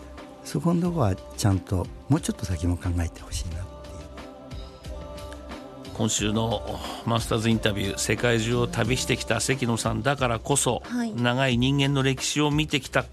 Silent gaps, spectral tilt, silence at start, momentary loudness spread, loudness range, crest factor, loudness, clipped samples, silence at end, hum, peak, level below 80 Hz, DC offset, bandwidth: none; -4.5 dB/octave; 0 s; 17 LU; 8 LU; 20 dB; -25 LUFS; under 0.1%; 0 s; none; -6 dBFS; -42 dBFS; under 0.1%; 13 kHz